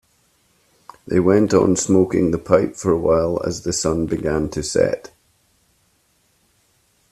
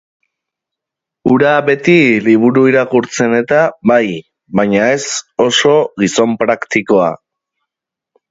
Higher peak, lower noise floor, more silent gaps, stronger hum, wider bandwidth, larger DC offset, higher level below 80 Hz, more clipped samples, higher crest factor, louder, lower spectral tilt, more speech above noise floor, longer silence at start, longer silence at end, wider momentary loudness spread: about the same, 0 dBFS vs 0 dBFS; second, -62 dBFS vs -83 dBFS; neither; neither; first, 13.5 kHz vs 8 kHz; neither; first, -46 dBFS vs -54 dBFS; neither; first, 20 dB vs 12 dB; second, -18 LUFS vs -12 LUFS; about the same, -5.5 dB/octave vs -4.5 dB/octave; second, 45 dB vs 72 dB; second, 1.05 s vs 1.25 s; first, 2.1 s vs 1.15 s; second, 6 LU vs 9 LU